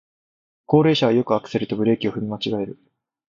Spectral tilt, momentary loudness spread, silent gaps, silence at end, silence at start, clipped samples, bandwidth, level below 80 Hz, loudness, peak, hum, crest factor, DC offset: -7.5 dB/octave; 9 LU; none; 0.6 s; 0.7 s; under 0.1%; 7.4 kHz; -58 dBFS; -21 LUFS; -2 dBFS; none; 20 dB; under 0.1%